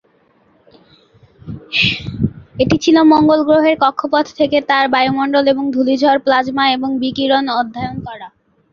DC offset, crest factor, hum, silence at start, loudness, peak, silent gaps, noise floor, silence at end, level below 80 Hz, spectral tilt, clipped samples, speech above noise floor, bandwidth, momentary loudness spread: under 0.1%; 14 dB; none; 1.45 s; -14 LUFS; 0 dBFS; none; -55 dBFS; 0.45 s; -44 dBFS; -5.5 dB/octave; under 0.1%; 41 dB; 7.2 kHz; 11 LU